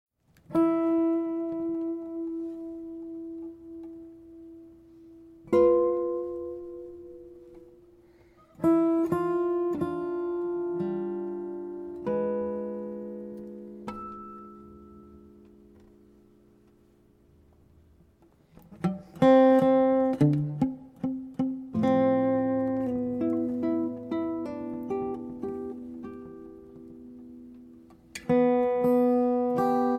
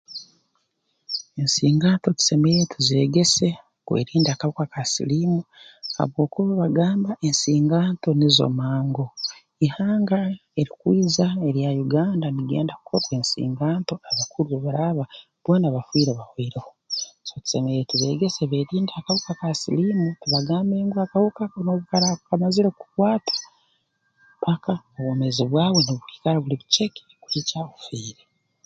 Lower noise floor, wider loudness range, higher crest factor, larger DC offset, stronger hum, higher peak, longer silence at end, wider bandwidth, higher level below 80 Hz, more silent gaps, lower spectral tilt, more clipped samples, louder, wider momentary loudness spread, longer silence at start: second, -61 dBFS vs -72 dBFS; first, 16 LU vs 4 LU; about the same, 20 dB vs 20 dB; neither; neither; second, -8 dBFS vs -2 dBFS; second, 0 s vs 0.55 s; first, 13 kHz vs 9.4 kHz; about the same, -62 dBFS vs -60 dBFS; neither; first, -8.5 dB/octave vs -5 dB/octave; neither; second, -27 LUFS vs -22 LUFS; first, 23 LU vs 11 LU; first, 0.5 s vs 0.1 s